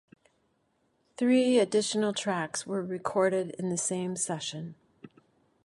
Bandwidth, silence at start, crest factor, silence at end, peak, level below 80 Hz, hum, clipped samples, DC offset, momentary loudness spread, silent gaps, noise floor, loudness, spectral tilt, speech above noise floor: 11.5 kHz; 1.2 s; 18 dB; 0.55 s; -12 dBFS; -76 dBFS; none; under 0.1%; under 0.1%; 10 LU; none; -73 dBFS; -29 LUFS; -4 dB/octave; 44 dB